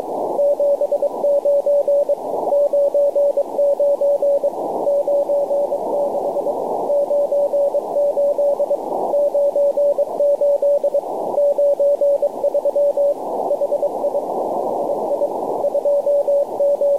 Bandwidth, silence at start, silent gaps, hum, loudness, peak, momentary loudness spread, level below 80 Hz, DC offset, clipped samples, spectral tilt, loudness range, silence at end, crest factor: 13 kHz; 0 s; none; none; -18 LUFS; -8 dBFS; 5 LU; -68 dBFS; 0.4%; under 0.1%; -6.5 dB/octave; 2 LU; 0 s; 8 dB